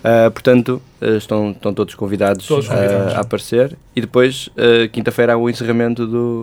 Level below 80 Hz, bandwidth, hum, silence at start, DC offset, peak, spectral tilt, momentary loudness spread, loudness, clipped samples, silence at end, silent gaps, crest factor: -50 dBFS; 17.5 kHz; none; 0.05 s; under 0.1%; 0 dBFS; -6 dB/octave; 8 LU; -16 LUFS; under 0.1%; 0 s; none; 16 dB